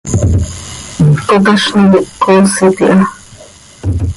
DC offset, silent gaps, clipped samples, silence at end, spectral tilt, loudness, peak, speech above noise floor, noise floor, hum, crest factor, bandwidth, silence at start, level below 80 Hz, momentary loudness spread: under 0.1%; none; under 0.1%; 0 s; -5.5 dB/octave; -10 LUFS; 0 dBFS; 28 dB; -36 dBFS; none; 10 dB; 11.5 kHz; 0.05 s; -24 dBFS; 12 LU